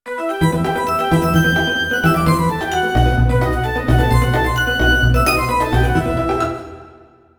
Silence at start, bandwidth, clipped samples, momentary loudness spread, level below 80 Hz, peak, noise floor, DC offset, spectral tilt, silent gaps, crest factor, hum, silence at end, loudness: 0.05 s; over 20 kHz; under 0.1%; 5 LU; -24 dBFS; -2 dBFS; -45 dBFS; under 0.1%; -6 dB/octave; none; 14 dB; none; 0.5 s; -16 LUFS